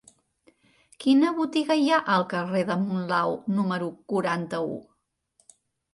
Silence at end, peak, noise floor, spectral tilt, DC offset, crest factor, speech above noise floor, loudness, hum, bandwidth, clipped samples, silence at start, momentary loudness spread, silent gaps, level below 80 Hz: 1.1 s; -10 dBFS; -69 dBFS; -6 dB/octave; under 0.1%; 16 dB; 44 dB; -25 LUFS; none; 11.5 kHz; under 0.1%; 1 s; 9 LU; none; -72 dBFS